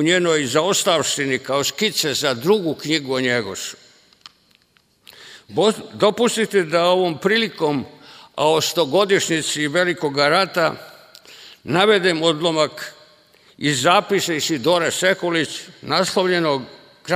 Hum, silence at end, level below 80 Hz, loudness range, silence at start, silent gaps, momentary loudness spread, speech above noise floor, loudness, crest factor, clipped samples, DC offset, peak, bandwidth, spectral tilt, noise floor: none; 0 s; -64 dBFS; 4 LU; 0 s; none; 10 LU; 41 dB; -19 LUFS; 20 dB; under 0.1%; under 0.1%; 0 dBFS; 16 kHz; -3.5 dB/octave; -60 dBFS